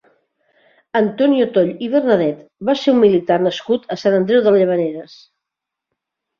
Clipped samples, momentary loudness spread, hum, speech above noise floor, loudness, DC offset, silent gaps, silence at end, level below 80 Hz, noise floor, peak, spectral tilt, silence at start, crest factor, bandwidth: under 0.1%; 9 LU; none; 67 dB; -16 LUFS; under 0.1%; none; 1.35 s; -62 dBFS; -83 dBFS; -2 dBFS; -7 dB/octave; 0.95 s; 16 dB; 7.2 kHz